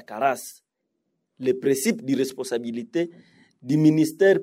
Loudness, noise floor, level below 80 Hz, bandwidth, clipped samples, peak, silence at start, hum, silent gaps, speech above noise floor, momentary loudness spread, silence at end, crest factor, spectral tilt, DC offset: -24 LUFS; -78 dBFS; -74 dBFS; 16 kHz; under 0.1%; -6 dBFS; 0.1 s; none; none; 55 dB; 12 LU; 0 s; 16 dB; -5.5 dB/octave; under 0.1%